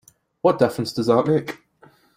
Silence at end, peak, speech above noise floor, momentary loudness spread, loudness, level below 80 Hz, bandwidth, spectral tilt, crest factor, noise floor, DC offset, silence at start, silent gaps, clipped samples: 0.6 s; -2 dBFS; 35 dB; 12 LU; -20 LUFS; -60 dBFS; 16 kHz; -6.5 dB/octave; 20 dB; -54 dBFS; under 0.1%; 0.45 s; none; under 0.1%